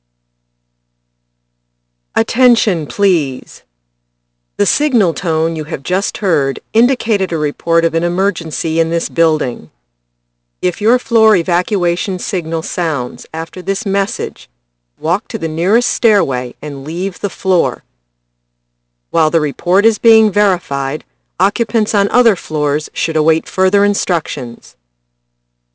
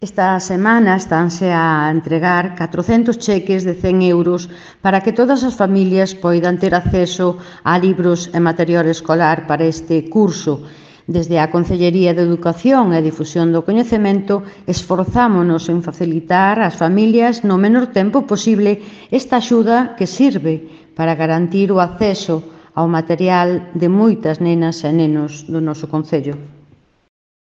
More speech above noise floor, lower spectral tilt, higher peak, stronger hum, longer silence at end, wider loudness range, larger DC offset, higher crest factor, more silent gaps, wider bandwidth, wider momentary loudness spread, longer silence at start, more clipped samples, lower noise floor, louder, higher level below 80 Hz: first, 54 dB vs 35 dB; second, -4.5 dB/octave vs -6.5 dB/octave; about the same, 0 dBFS vs 0 dBFS; first, 60 Hz at -45 dBFS vs none; about the same, 1.05 s vs 0.95 s; about the same, 4 LU vs 2 LU; neither; about the same, 16 dB vs 14 dB; neither; about the same, 8 kHz vs 7.8 kHz; first, 11 LU vs 8 LU; first, 2.15 s vs 0 s; neither; first, -68 dBFS vs -50 dBFS; about the same, -14 LUFS vs -15 LUFS; second, -60 dBFS vs -42 dBFS